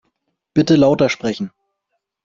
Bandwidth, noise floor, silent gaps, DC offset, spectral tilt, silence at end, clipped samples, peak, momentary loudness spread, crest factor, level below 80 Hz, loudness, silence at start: 7.6 kHz; -75 dBFS; none; under 0.1%; -6.5 dB/octave; 0.75 s; under 0.1%; -2 dBFS; 14 LU; 16 dB; -52 dBFS; -16 LUFS; 0.55 s